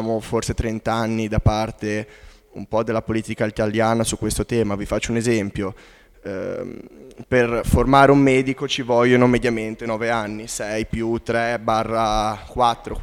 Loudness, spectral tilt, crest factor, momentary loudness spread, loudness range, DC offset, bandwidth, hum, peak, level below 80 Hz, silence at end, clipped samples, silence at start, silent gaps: -20 LUFS; -5.5 dB/octave; 20 dB; 13 LU; 6 LU; under 0.1%; 16.5 kHz; none; 0 dBFS; -36 dBFS; 0 s; under 0.1%; 0 s; none